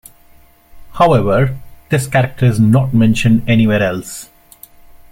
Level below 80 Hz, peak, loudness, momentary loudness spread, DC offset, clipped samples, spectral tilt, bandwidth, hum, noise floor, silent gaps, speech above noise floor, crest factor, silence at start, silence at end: -38 dBFS; -2 dBFS; -13 LUFS; 11 LU; under 0.1%; under 0.1%; -7 dB/octave; 16.5 kHz; none; -45 dBFS; none; 33 dB; 14 dB; 0.75 s; 0.9 s